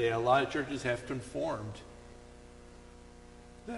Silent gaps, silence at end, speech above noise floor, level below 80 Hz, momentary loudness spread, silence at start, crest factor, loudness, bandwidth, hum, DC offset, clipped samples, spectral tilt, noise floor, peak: none; 0 s; 21 dB; -56 dBFS; 26 LU; 0 s; 22 dB; -33 LUFS; 11.5 kHz; 60 Hz at -55 dBFS; under 0.1%; under 0.1%; -5.5 dB/octave; -53 dBFS; -14 dBFS